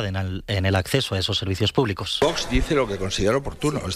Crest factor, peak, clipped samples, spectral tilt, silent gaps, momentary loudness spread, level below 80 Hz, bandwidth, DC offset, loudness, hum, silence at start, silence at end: 18 dB; -6 dBFS; under 0.1%; -5 dB/octave; none; 4 LU; -36 dBFS; 15.5 kHz; under 0.1%; -23 LUFS; none; 0 s; 0 s